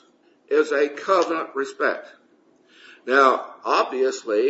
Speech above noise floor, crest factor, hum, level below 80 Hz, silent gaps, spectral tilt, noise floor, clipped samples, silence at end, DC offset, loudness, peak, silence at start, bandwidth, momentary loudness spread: 37 dB; 20 dB; none; -84 dBFS; none; -2.5 dB/octave; -58 dBFS; under 0.1%; 0 s; under 0.1%; -21 LUFS; -4 dBFS; 0.5 s; 8 kHz; 9 LU